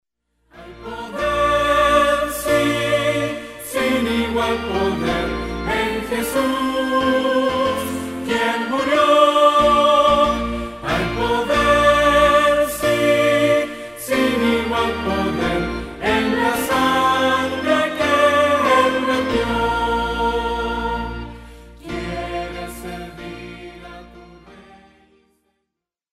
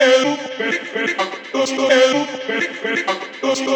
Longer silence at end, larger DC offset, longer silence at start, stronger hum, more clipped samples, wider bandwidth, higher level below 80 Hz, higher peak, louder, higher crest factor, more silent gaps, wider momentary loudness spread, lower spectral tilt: first, 1.5 s vs 0 s; neither; first, 0.55 s vs 0 s; neither; neither; first, 16 kHz vs 8.6 kHz; first, -38 dBFS vs -80 dBFS; about the same, -2 dBFS vs -2 dBFS; about the same, -18 LUFS vs -18 LUFS; about the same, 18 dB vs 16 dB; neither; first, 16 LU vs 9 LU; first, -4.5 dB/octave vs -2.5 dB/octave